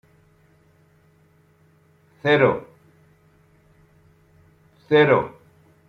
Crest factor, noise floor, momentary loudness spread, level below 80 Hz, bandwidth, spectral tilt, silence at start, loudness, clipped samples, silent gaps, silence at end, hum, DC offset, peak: 22 dB; -58 dBFS; 14 LU; -62 dBFS; 6.4 kHz; -7.5 dB/octave; 2.25 s; -19 LUFS; under 0.1%; none; 0.6 s; none; under 0.1%; -4 dBFS